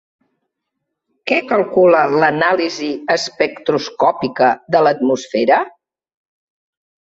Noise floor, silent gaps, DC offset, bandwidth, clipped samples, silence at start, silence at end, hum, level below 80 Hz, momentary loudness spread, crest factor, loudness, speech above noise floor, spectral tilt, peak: -76 dBFS; none; under 0.1%; 8 kHz; under 0.1%; 1.25 s; 1.3 s; none; -62 dBFS; 7 LU; 16 dB; -15 LUFS; 62 dB; -4.5 dB/octave; -2 dBFS